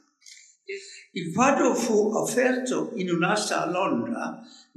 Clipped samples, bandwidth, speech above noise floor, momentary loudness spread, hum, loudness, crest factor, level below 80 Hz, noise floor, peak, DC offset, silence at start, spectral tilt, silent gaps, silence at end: under 0.1%; 14.5 kHz; 27 dB; 16 LU; none; -25 LUFS; 20 dB; -78 dBFS; -52 dBFS; -6 dBFS; under 0.1%; 0.3 s; -4.5 dB/octave; none; 0.3 s